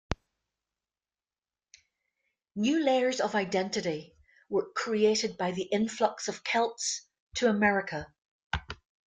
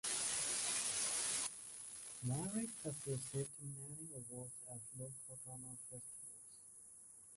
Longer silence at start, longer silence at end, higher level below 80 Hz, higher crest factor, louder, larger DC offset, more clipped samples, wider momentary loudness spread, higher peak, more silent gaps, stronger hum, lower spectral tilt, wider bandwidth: about the same, 0.1 s vs 0.05 s; first, 0.4 s vs 0 s; first, -54 dBFS vs -76 dBFS; about the same, 20 dB vs 20 dB; first, -30 LUFS vs -43 LUFS; neither; neither; about the same, 14 LU vs 16 LU; first, -10 dBFS vs -26 dBFS; first, 7.20-7.27 s, 8.25-8.50 s vs none; neither; first, -4 dB/octave vs -2.5 dB/octave; second, 9.6 kHz vs 12 kHz